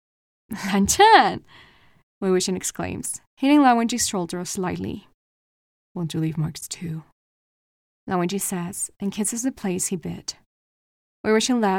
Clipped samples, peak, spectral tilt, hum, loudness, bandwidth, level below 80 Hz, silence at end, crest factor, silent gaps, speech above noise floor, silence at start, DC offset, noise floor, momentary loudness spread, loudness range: under 0.1%; 0 dBFS; -4 dB/octave; none; -22 LUFS; 17 kHz; -54 dBFS; 0 s; 22 dB; 2.03-2.21 s, 3.27-3.37 s, 5.14-5.95 s, 7.12-8.07 s, 10.46-11.24 s; over 68 dB; 0.5 s; under 0.1%; under -90 dBFS; 17 LU; 10 LU